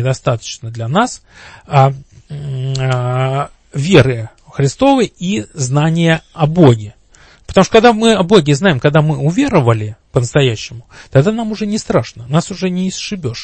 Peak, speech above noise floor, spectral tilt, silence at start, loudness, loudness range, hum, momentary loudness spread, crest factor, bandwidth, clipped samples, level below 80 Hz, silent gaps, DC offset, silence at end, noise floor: 0 dBFS; 32 dB; -6 dB/octave; 0 s; -14 LUFS; 5 LU; none; 13 LU; 14 dB; 8.8 kHz; 0.1%; -42 dBFS; none; under 0.1%; 0 s; -45 dBFS